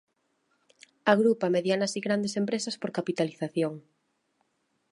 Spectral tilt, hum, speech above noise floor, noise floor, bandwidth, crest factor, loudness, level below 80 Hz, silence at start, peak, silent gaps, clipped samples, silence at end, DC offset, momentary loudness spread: -5 dB/octave; none; 47 dB; -74 dBFS; 11.5 kHz; 22 dB; -28 LUFS; -78 dBFS; 1.05 s; -6 dBFS; none; under 0.1%; 1.1 s; under 0.1%; 9 LU